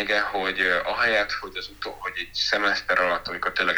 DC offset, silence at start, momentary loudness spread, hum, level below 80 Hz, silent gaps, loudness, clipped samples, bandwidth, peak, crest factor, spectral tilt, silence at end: under 0.1%; 0 s; 10 LU; none; -52 dBFS; none; -24 LUFS; under 0.1%; over 20 kHz; -6 dBFS; 18 dB; -2.5 dB/octave; 0 s